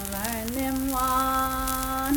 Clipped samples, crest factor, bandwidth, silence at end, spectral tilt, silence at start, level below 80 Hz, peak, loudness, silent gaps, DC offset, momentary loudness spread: under 0.1%; 18 dB; 19 kHz; 0 s; -3.5 dB/octave; 0 s; -38 dBFS; -8 dBFS; -26 LUFS; none; under 0.1%; 5 LU